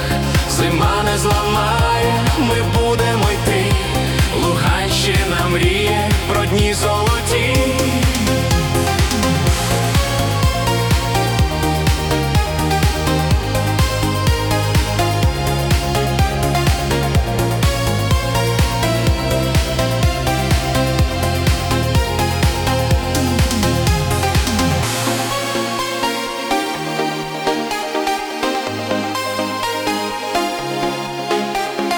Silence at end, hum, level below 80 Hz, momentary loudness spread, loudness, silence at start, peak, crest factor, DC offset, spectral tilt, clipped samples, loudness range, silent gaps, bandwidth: 0 s; none; -24 dBFS; 4 LU; -17 LUFS; 0 s; -4 dBFS; 12 dB; under 0.1%; -4.5 dB/octave; under 0.1%; 4 LU; none; 19 kHz